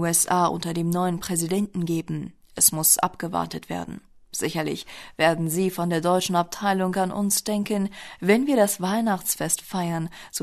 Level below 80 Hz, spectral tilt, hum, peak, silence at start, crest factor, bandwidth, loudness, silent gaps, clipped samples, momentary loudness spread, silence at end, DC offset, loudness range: -58 dBFS; -4 dB/octave; none; -4 dBFS; 0 s; 20 dB; 13.5 kHz; -23 LUFS; none; under 0.1%; 13 LU; 0 s; under 0.1%; 3 LU